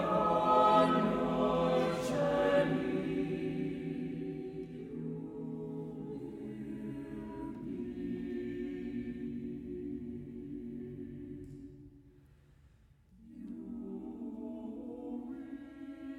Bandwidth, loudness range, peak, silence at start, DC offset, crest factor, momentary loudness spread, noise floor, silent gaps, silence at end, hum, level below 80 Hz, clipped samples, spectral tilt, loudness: 15.5 kHz; 17 LU; -16 dBFS; 0 s; under 0.1%; 20 dB; 17 LU; -63 dBFS; none; 0 s; none; -60 dBFS; under 0.1%; -7 dB/octave; -35 LUFS